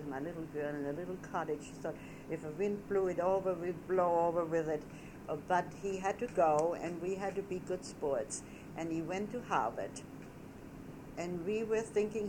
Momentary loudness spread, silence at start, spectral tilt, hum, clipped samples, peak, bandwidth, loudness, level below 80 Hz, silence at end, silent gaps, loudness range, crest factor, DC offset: 16 LU; 0 s; -6 dB/octave; none; under 0.1%; -18 dBFS; 19 kHz; -36 LUFS; -62 dBFS; 0 s; none; 5 LU; 18 dB; under 0.1%